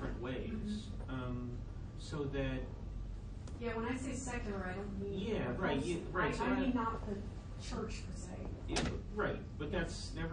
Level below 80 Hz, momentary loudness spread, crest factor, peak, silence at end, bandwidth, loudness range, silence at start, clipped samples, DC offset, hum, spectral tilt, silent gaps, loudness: -46 dBFS; 11 LU; 18 dB; -22 dBFS; 0 s; 10 kHz; 5 LU; 0 s; under 0.1%; under 0.1%; none; -5.5 dB/octave; none; -40 LUFS